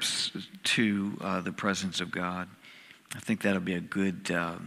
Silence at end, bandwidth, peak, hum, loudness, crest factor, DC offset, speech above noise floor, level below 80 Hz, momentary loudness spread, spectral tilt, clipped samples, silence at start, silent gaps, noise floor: 0 s; 15.5 kHz; -12 dBFS; none; -31 LUFS; 20 dB; under 0.1%; 22 dB; -70 dBFS; 13 LU; -4 dB/octave; under 0.1%; 0 s; none; -53 dBFS